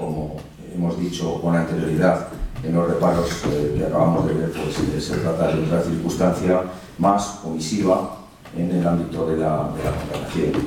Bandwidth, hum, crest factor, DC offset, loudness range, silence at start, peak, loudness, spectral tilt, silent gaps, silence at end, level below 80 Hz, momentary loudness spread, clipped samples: 16.5 kHz; none; 16 dB; under 0.1%; 1 LU; 0 s; -4 dBFS; -22 LUFS; -6.5 dB/octave; none; 0 s; -40 dBFS; 9 LU; under 0.1%